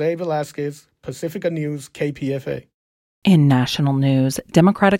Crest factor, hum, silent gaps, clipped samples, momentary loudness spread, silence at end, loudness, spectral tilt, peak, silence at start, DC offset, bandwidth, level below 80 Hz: 18 dB; none; 2.74-3.22 s; under 0.1%; 15 LU; 0 s; -20 LUFS; -6.5 dB/octave; 0 dBFS; 0 s; under 0.1%; 16 kHz; -54 dBFS